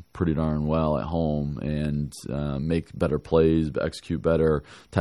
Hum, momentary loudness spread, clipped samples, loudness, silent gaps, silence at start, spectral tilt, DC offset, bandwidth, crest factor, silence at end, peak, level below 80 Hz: none; 8 LU; under 0.1%; -26 LUFS; none; 0.15 s; -8 dB/octave; under 0.1%; 12 kHz; 18 dB; 0 s; -6 dBFS; -42 dBFS